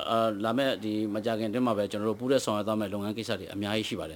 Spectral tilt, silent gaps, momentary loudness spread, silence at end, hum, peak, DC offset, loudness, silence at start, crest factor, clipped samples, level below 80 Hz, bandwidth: -5 dB/octave; none; 6 LU; 0 s; none; -12 dBFS; under 0.1%; -30 LUFS; 0 s; 18 dB; under 0.1%; -66 dBFS; 19.5 kHz